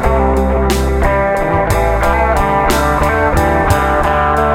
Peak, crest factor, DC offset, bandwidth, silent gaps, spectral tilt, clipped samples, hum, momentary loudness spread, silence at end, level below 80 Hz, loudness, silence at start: 0 dBFS; 12 dB; under 0.1%; 16.5 kHz; none; -6 dB/octave; under 0.1%; none; 1 LU; 0 s; -18 dBFS; -13 LUFS; 0 s